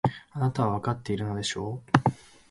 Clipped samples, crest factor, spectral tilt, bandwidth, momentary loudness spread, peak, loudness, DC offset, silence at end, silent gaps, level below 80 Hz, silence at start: under 0.1%; 26 dB; -6 dB/octave; 11.5 kHz; 6 LU; -2 dBFS; -28 LUFS; under 0.1%; 0.35 s; none; -54 dBFS; 0.05 s